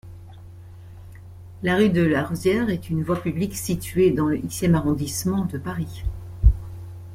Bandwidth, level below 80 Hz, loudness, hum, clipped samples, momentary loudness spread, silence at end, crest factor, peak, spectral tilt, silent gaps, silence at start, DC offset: 16.5 kHz; -32 dBFS; -23 LUFS; none; under 0.1%; 24 LU; 0 s; 20 dB; -4 dBFS; -6 dB/octave; none; 0.05 s; under 0.1%